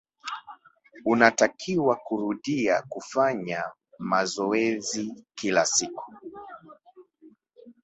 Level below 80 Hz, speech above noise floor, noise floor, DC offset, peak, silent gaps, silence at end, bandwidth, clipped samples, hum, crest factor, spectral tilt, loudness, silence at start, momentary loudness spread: -68 dBFS; 31 dB; -56 dBFS; under 0.1%; -2 dBFS; none; 0.15 s; 8.4 kHz; under 0.1%; none; 24 dB; -3.5 dB/octave; -25 LUFS; 0.25 s; 19 LU